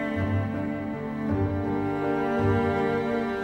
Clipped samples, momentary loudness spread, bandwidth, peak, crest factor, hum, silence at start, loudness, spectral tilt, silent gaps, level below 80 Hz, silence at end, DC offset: under 0.1%; 7 LU; 8.2 kHz; -12 dBFS; 14 dB; none; 0 s; -27 LUFS; -8.5 dB/octave; none; -48 dBFS; 0 s; under 0.1%